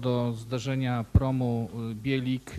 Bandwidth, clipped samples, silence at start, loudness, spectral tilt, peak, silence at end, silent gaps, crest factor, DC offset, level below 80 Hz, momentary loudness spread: 13.5 kHz; under 0.1%; 0 s; -29 LUFS; -7.5 dB/octave; -8 dBFS; 0 s; none; 20 dB; under 0.1%; -38 dBFS; 7 LU